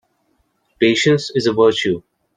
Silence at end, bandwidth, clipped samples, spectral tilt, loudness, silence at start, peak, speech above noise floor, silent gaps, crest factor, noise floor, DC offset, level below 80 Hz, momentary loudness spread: 0.35 s; 9.6 kHz; under 0.1%; -5 dB/octave; -16 LUFS; 0.8 s; -2 dBFS; 49 dB; none; 16 dB; -64 dBFS; under 0.1%; -58 dBFS; 7 LU